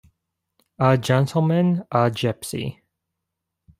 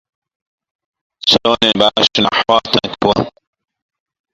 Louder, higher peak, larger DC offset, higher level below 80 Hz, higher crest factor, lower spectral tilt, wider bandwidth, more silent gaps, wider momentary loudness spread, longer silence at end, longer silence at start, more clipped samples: second, -21 LUFS vs -13 LUFS; about the same, -2 dBFS vs 0 dBFS; neither; second, -58 dBFS vs -48 dBFS; about the same, 20 dB vs 16 dB; first, -6.5 dB/octave vs -4 dB/octave; about the same, 15.5 kHz vs 15.5 kHz; neither; first, 10 LU vs 6 LU; about the same, 1.05 s vs 1.05 s; second, 0.8 s vs 1.25 s; neither